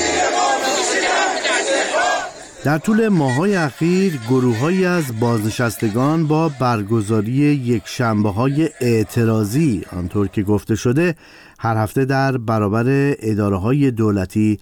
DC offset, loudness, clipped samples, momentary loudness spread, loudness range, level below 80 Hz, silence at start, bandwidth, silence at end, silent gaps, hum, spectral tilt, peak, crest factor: under 0.1%; -18 LUFS; under 0.1%; 4 LU; 2 LU; -48 dBFS; 0 s; 18.5 kHz; 0.05 s; none; none; -5.5 dB/octave; -6 dBFS; 10 dB